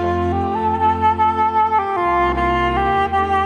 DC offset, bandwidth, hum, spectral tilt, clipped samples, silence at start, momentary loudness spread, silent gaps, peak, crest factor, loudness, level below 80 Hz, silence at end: under 0.1%; 9.6 kHz; none; -7 dB/octave; under 0.1%; 0 s; 3 LU; none; -6 dBFS; 12 dB; -17 LUFS; -34 dBFS; 0 s